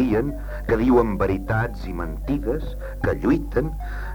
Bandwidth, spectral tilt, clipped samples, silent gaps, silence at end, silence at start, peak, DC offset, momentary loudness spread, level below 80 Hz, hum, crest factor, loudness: over 20 kHz; -8.5 dB/octave; under 0.1%; none; 0 s; 0 s; -6 dBFS; under 0.1%; 12 LU; -30 dBFS; none; 18 dB; -24 LUFS